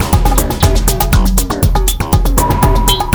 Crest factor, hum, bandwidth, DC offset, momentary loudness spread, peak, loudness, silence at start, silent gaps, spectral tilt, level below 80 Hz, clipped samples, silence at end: 10 dB; none; over 20 kHz; 0.3%; 3 LU; 0 dBFS; -13 LUFS; 0 s; none; -4.5 dB/octave; -14 dBFS; under 0.1%; 0 s